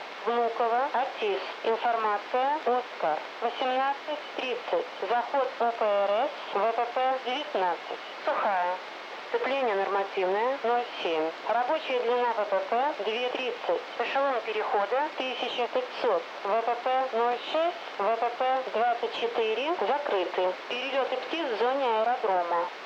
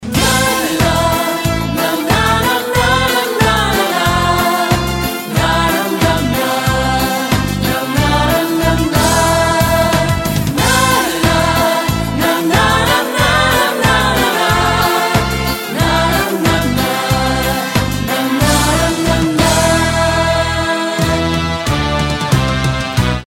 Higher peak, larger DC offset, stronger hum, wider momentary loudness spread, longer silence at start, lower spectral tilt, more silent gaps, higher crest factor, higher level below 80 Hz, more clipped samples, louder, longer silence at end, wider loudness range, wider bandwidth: second, -16 dBFS vs 0 dBFS; neither; neither; about the same, 4 LU vs 4 LU; about the same, 0 s vs 0 s; about the same, -3.5 dB/octave vs -4 dB/octave; neither; about the same, 12 dB vs 14 dB; second, under -90 dBFS vs -26 dBFS; neither; second, -28 LUFS vs -13 LUFS; about the same, 0 s vs 0 s; about the same, 1 LU vs 2 LU; second, 8.4 kHz vs 17 kHz